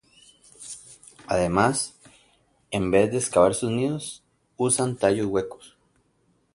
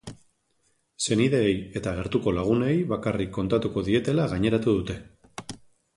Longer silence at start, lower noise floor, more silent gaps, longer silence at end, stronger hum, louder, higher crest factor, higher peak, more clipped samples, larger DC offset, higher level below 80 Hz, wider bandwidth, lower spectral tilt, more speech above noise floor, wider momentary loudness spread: first, 0.6 s vs 0.05 s; about the same, -67 dBFS vs -70 dBFS; neither; first, 0.9 s vs 0.4 s; neither; about the same, -24 LUFS vs -25 LUFS; about the same, 22 dB vs 18 dB; first, -4 dBFS vs -8 dBFS; neither; neither; about the same, -52 dBFS vs -48 dBFS; about the same, 11.5 kHz vs 11.5 kHz; second, -4.5 dB/octave vs -6 dB/octave; about the same, 44 dB vs 45 dB; about the same, 19 LU vs 18 LU